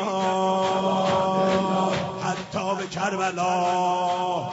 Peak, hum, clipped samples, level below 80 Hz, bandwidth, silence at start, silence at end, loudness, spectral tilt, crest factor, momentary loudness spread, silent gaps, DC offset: -10 dBFS; none; under 0.1%; -60 dBFS; 8 kHz; 0 s; 0 s; -24 LUFS; -4 dB/octave; 14 dB; 6 LU; none; under 0.1%